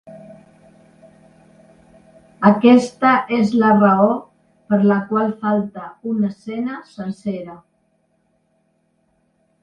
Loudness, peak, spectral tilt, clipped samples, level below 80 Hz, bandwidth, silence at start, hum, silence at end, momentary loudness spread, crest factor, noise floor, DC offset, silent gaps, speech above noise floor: -17 LUFS; 0 dBFS; -7.5 dB/octave; under 0.1%; -62 dBFS; 9.2 kHz; 0.05 s; none; 2.05 s; 16 LU; 18 dB; -64 dBFS; under 0.1%; none; 48 dB